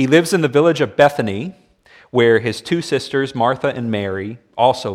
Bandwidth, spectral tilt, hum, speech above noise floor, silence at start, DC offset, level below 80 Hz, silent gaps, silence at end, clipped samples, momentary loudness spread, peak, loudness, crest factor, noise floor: 16 kHz; -5.5 dB/octave; none; 33 dB; 0 s; under 0.1%; -58 dBFS; none; 0 s; under 0.1%; 10 LU; 0 dBFS; -17 LUFS; 16 dB; -49 dBFS